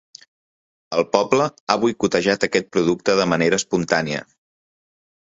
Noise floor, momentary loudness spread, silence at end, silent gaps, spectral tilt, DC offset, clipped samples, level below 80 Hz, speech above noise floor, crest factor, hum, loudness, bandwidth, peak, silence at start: under -90 dBFS; 4 LU; 1.2 s; 1.60-1.67 s; -4.5 dB/octave; under 0.1%; under 0.1%; -58 dBFS; over 71 dB; 22 dB; none; -20 LUFS; 7.8 kHz; 0 dBFS; 0.9 s